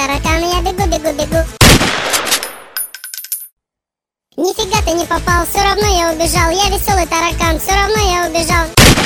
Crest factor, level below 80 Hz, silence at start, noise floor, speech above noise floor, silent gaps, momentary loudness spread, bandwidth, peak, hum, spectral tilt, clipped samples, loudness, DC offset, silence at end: 14 dB; -22 dBFS; 0 s; -86 dBFS; 72 dB; 3.53-3.57 s; 14 LU; 19.5 kHz; 0 dBFS; none; -3.5 dB/octave; 0.2%; -13 LUFS; under 0.1%; 0 s